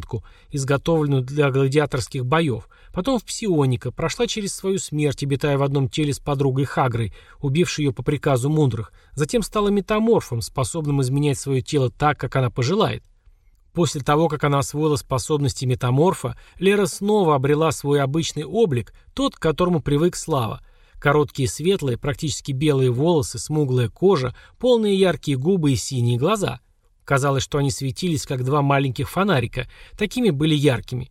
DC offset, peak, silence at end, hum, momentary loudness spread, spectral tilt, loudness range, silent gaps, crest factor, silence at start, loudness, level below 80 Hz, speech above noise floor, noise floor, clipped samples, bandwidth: under 0.1%; -4 dBFS; 0.05 s; none; 7 LU; -6 dB/octave; 2 LU; none; 18 dB; 0 s; -21 LUFS; -44 dBFS; 33 dB; -54 dBFS; under 0.1%; 15 kHz